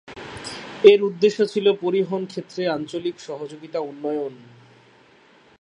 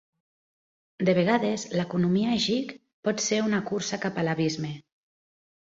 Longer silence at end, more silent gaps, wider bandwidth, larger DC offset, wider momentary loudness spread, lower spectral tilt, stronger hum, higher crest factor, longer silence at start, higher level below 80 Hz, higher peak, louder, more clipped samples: first, 1.25 s vs 0.85 s; second, none vs 2.93-3.03 s; first, 10.5 kHz vs 7.8 kHz; neither; first, 19 LU vs 9 LU; about the same, -5.5 dB/octave vs -5 dB/octave; neither; about the same, 22 dB vs 20 dB; second, 0.1 s vs 1 s; about the same, -64 dBFS vs -66 dBFS; first, 0 dBFS vs -8 dBFS; first, -21 LUFS vs -26 LUFS; neither